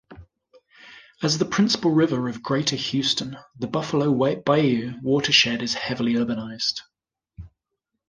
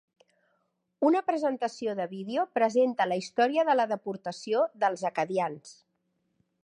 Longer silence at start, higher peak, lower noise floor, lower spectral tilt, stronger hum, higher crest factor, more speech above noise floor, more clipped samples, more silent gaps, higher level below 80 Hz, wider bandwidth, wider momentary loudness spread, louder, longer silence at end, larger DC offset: second, 0.1 s vs 1 s; first, -2 dBFS vs -12 dBFS; first, -81 dBFS vs -76 dBFS; about the same, -4.5 dB/octave vs -5 dB/octave; neither; about the same, 22 dB vs 18 dB; first, 59 dB vs 49 dB; neither; neither; first, -56 dBFS vs -84 dBFS; about the same, 10 kHz vs 10.5 kHz; about the same, 10 LU vs 9 LU; first, -22 LUFS vs -28 LUFS; second, 0.6 s vs 0.9 s; neither